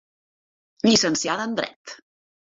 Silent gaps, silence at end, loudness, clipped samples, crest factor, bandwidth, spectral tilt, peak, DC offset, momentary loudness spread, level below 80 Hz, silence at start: 1.76-1.85 s; 0.6 s; -22 LUFS; under 0.1%; 20 dB; 8 kHz; -3 dB/octave; -6 dBFS; under 0.1%; 20 LU; -62 dBFS; 0.85 s